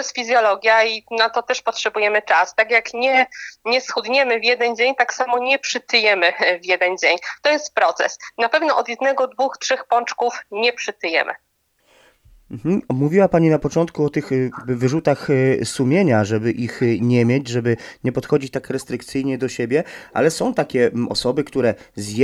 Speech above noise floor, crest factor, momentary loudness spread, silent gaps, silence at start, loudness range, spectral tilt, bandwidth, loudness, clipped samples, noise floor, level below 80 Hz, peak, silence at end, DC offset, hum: 41 dB; 18 dB; 8 LU; none; 0 s; 4 LU; -5 dB/octave; 13 kHz; -19 LUFS; under 0.1%; -60 dBFS; -56 dBFS; -2 dBFS; 0 s; under 0.1%; none